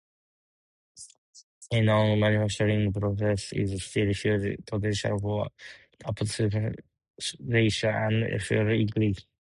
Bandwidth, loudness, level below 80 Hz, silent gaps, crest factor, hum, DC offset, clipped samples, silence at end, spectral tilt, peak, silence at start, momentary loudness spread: 11.5 kHz; -27 LUFS; -50 dBFS; 1.18-1.33 s, 1.44-1.61 s, 7.10-7.14 s; 18 dB; none; under 0.1%; under 0.1%; 0.25 s; -6 dB/octave; -10 dBFS; 0.95 s; 13 LU